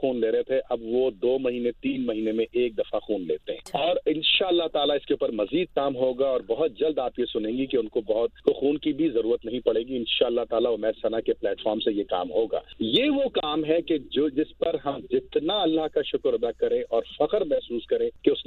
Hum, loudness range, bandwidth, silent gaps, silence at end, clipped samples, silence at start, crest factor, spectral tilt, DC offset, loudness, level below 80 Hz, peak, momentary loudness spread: none; 2 LU; 9.6 kHz; none; 0.05 s; under 0.1%; 0 s; 20 dB; -6 dB/octave; under 0.1%; -26 LUFS; -56 dBFS; -6 dBFS; 5 LU